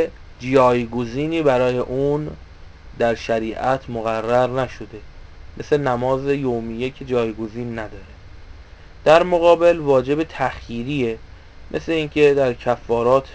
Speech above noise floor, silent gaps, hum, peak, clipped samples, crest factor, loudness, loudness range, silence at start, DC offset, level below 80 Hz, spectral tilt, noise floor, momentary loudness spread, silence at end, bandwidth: 22 dB; none; none; 0 dBFS; under 0.1%; 20 dB; -19 LUFS; 5 LU; 0 s; under 0.1%; -42 dBFS; -6.5 dB/octave; -41 dBFS; 14 LU; 0 s; 8 kHz